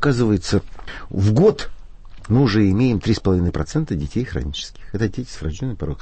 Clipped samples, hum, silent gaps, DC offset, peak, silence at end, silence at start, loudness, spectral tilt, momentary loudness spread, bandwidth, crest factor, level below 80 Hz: under 0.1%; none; none; under 0.1%; -4 dBFS; 0 s; 0 s; -20 LUFS; -7 dB/octave; 14 LU; 8.8 kHz; 16 dB; -34 dBFS